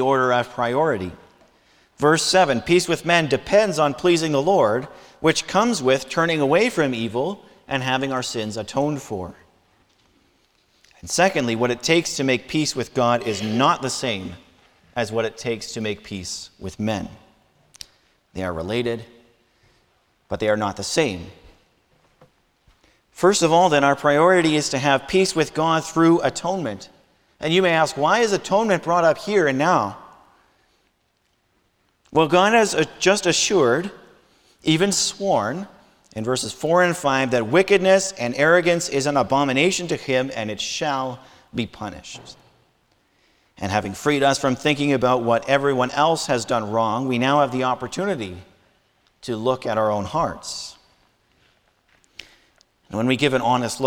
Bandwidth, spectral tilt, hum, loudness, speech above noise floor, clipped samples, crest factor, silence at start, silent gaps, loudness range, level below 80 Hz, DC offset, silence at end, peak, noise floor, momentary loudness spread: 19 kHz; -4 dB/octave; none; -20 LUFS; 47 dB; under 0.1%; 18 dB; 0 s; none; 10 LU; -56 dBFS; under 0.1%; 0 s; -2 dBFS; -67 dBFS; 14 LU